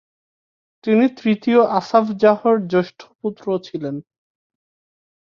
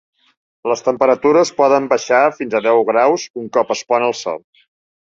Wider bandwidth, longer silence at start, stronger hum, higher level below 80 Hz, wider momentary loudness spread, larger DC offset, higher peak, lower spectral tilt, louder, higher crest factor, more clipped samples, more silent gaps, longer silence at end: second, 7 kHz vs 7.8 kHz; first, 0.85 s vs 0.65 s; neither; about the same, -66 dBFS vs -64 dBFS; first, 14 LU vs 8 LU; neither; about the same, -2 dBFS vs 0 dBFS; first, -7.5 dB/octave vs -4 dB/octave; second, -18 LUFS vs -15 LUFS; about the same, 18 dB vs 16 dB; neither; about the same, 3.15-3.19 s vs 3.30-3.34 s; first, 1.3 s vs 0.7 s